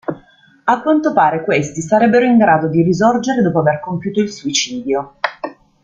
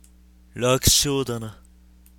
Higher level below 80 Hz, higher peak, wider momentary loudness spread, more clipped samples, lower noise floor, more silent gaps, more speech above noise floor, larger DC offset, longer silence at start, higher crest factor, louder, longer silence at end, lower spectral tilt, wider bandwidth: second, -54 dBFS vs -38 dBFS; about the same, -2 dBFS vs -2 dBFS; second, 11 LU vs 21 LU; neither; second, -48 dBFS vs -52 dBFS; neither; first, 34 dB vs 30 dB; neither; second, 0.1 s vs 0.55 s; second, 14 dB vs 22 dB; first, -15 LUFS vs -20 LUFS; second, 0.3 s vs 0.65 s; first, -5 dB/octave vs -3 dB/octave; second, 7.8 kHz vs 17.5 kHz